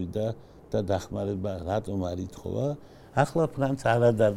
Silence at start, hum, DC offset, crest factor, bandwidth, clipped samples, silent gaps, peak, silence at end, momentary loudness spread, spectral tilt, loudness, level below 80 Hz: 0 s; none; under 0.1%; 20 dB; 14.5 kHz; under 0.1%; none; -8 dBFS; 0 s; 11 LU; -7 dB/octave; -28 LUFS; -52 dBFS